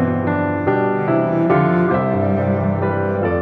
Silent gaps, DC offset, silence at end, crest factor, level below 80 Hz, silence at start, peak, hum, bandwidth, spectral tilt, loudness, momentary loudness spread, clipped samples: none; under 0.1%; 0 s; 14 dB; -48 dBFS; 0 s; -2 dBFS; none; 4.9 kHz; -11 dB/octave; -17 LUFS; 4 LU; under 0.1%